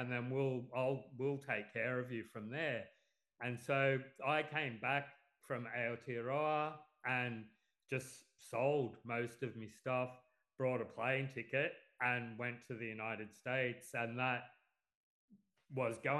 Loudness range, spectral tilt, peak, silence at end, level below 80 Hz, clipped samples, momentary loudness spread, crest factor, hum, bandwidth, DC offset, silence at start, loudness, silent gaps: 3 LU; -6 dB/octave; -22 dBFS; 0 s; -86 dBFS; under 0.1%; 10 LU; 20 dB; none; 12 kHz; under 0.1%; 0 s; -40 LUFS; 14.95-15.28 s